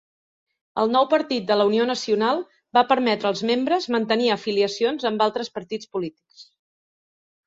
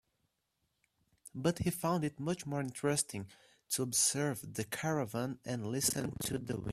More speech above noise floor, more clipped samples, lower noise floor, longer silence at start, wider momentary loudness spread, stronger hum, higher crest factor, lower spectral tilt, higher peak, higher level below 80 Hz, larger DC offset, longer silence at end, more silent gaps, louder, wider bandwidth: first, over 68 dB vs 47 dB; neither; first, under -90 dBFS vs -82 dBFS; second, 0.75 s vs 1.25 s; about the same, 11 LU vs 10 LU; neither; about the same, 18 dB vs 20 dB; about the same, -4.5 dB/octave vs -4 dB/octave; first, -4 dBFS vs -16 dBFS; about the same, -68 dBFS vs -64 dBFS; neither; first, 1.05 s vs 0 s; neither; first, -22 LUFS vs -35 LUFS; second, 7.8 kHz vs 15.5 kHz